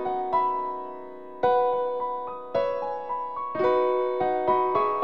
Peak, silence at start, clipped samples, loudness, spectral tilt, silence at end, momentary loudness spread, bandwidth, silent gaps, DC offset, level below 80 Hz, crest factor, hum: -10 dBFS; 0 s; under 0.1%; -26 LUFS; -7.5 dB/octave; 0 s; 10 LU; 5.8 kHz; none; 0.5%; -64 dBFS; 16 dB; none